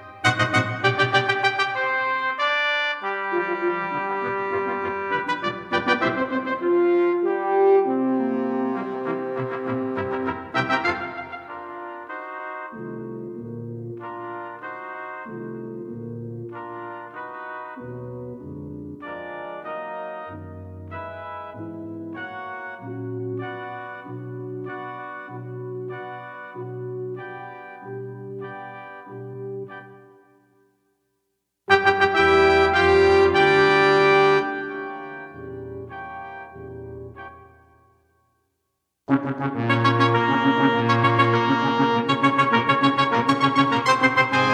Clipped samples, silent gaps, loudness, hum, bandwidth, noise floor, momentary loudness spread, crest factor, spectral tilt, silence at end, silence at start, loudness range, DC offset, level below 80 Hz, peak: under 0.1%; none; -21 LUFS; none; 10 kHz; -77 dBFS; 19 LU; 20 dB; -6 dB/octave; 0 s; 0 s; 17 LU; under 0.1%; -54 dBFS; -2 dBFS